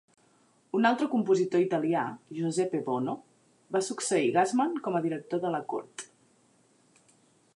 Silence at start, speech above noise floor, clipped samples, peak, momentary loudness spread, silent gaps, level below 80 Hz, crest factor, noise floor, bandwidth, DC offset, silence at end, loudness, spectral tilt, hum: 0.75 s; 37 dB; under 0.1%; -10 dBFS; 11 LU; none; -82 dBFS; 20 dB; -65 dBFS; 11.5 kHz; under 0.1%; 1.5 s; -29 LUFS; -5 dB/octave; none